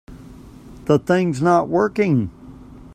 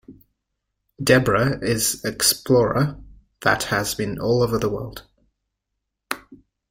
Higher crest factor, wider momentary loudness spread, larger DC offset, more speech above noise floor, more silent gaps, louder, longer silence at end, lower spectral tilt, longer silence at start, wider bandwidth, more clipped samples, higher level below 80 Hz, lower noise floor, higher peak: about the same, 18 dB vs 20 dB; second, 8 LU vs 15 LU; neither; second, 23 dB vs 60 dB; neither; about the same, -18 LUFS vs -20 LUFS; second, 0.05 s vs 0.35 s; first, -7.5 dB/octave vs -4 dB/octave; about the same, 0.1 s vs 0.1 s; second, 13.5 kHz vs 16.5 kHz; neither; about the same, -48 dBFS vs -46 dBFS; second, -41 dBFS vs -80 dBFS; about the same, -2 dBFS vs -2 dBFS